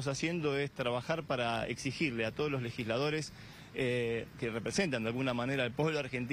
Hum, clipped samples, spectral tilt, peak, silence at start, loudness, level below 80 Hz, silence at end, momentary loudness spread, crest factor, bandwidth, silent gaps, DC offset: none; under 0.1%; -5 dB/octave; -18 dBFS; 0 s; -35 LUFS; -62 dBFS; 0 s; 5 LU; 16 dB; 15.5 kHz; none; under 0.1%